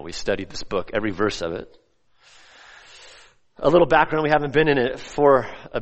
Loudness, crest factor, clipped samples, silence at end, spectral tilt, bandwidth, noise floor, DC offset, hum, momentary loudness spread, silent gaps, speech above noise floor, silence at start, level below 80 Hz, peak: -21 LUFS; 20 dB; under 0.1%; 0 s; -5.5 dB/octave; 8.4 kHz; -59 dBFS; under 0.1%; none; 11 LU; none; 38 dB; 0 s; -46 dBFS; -2 dBFS